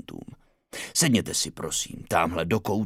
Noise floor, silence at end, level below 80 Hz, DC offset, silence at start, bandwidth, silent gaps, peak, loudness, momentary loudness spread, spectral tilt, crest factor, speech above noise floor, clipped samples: -50 dBFS; 0 s; -52 dBFS; under 0.1%; 0.1 s; 16.5 kHz; none; -6 dBFS; -25 LUFS; 19 LU; -3.5 dB/octave; 20 dB; 24 dB; under 0.1%